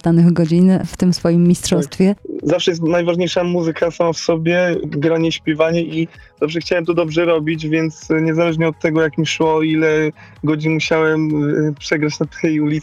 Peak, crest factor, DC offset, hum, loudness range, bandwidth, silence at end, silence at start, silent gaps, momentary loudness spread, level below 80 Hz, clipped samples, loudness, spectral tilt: -2 dBFS; 12 dB; under 0.1%; none; 2 LU; 12 kHz; 0 s; 0.05 s; none; 6 LU; -48 dBFS; under 0.1%; -16 LUFS; -6 dB/octave